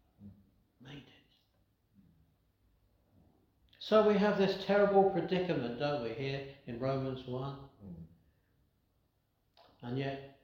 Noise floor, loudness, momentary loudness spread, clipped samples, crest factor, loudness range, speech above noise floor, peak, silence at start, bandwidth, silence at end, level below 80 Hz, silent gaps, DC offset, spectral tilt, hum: -77 dBFS; -32 LUFS; 24 LU; under 0.1%; 20 dB; 12 LU; 45 dB; -14 dBFS; 0.2 s; 7 kHz; 0.15 s; -68 dBFS; none; under 0.1%; -7.5 dB/octave; none